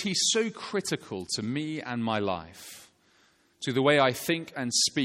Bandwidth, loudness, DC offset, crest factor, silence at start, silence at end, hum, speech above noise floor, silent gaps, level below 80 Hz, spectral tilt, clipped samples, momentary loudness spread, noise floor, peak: 16.5 kHz; -28 LUFS; under 0.1%; 20 dB; 0 s; 0 s; none; 36 dB; none; -68 dBFS; -3 dB/octave; under 0.1%; 13 LU; -64 dBFS; -8 dBFS